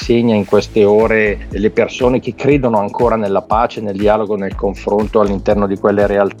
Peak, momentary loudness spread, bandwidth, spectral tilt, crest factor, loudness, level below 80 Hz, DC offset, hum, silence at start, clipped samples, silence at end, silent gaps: 0 dBFS; 5 LU; 10.5 kHz; -7 dB/octave; 14 dB; -14 LUFS; -32 dBFS; under 0.1%; none; 0 s; under 0.1%; 0 s; none